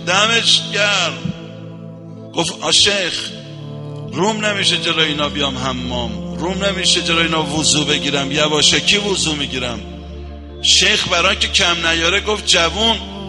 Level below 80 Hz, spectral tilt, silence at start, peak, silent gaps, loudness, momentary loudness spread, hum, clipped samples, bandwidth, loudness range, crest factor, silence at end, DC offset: -36 dBFS; -2 dB/octave; 0 s; 0 dBFS; none; -14 LUFS; 20 LU; none; under 0.1%; 11.5 kHz; 4 LU; 16 dB; 0 s; under 0.1%